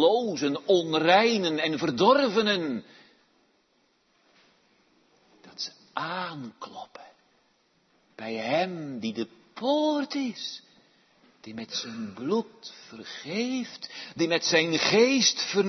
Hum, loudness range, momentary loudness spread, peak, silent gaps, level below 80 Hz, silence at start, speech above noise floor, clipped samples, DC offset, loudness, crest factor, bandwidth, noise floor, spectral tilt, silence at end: none; 14 LU; 20 LU; -6 dBFS; none; -78 dBFS; 0 s; 42 dB; under 0.1%; under 0.1%; -26 LUFS; 22 dB; 6.4 kHz; -68 dBFS; -3.5 dB/octave; 0 s